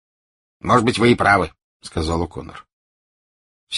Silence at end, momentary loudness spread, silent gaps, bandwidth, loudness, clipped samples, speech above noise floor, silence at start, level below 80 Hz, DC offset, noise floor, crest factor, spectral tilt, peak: 0 s; 16 LU; 1.64-1.80 s, 2.73-3.67 s; 11.5 kHz; -18 LUFS; under 0.1%; over 72 dB; 0.65 s; -40 dBFS; under 0.1%; under -90 dBFS; 20 dB; -5.5 dB/octave; -2 dBFS